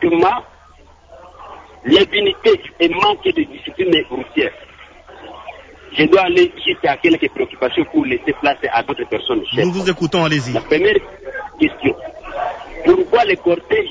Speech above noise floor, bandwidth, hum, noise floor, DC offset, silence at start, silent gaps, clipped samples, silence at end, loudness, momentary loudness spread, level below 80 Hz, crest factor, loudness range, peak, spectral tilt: 30 dB; 7.8 kHz; none; -45 dBFS; under 0.1%; 0 s; none; under 0.1%; 0 s; -16 LUFS; 16 LU; -46 dBFS; 16 dB; 2 LU; -2 dBFS; -5.5 dB/octave